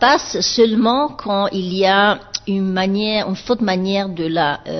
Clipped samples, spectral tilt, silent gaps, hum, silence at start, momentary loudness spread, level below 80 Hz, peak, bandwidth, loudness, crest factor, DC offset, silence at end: under 0.1%; -4.5 dB/octave; none; none; 0 s; 7 LU; -48 dBFS; -2 dBFS; 6.4 kHz; -17 LUFS; 16 dB; under 0.1%; 0 s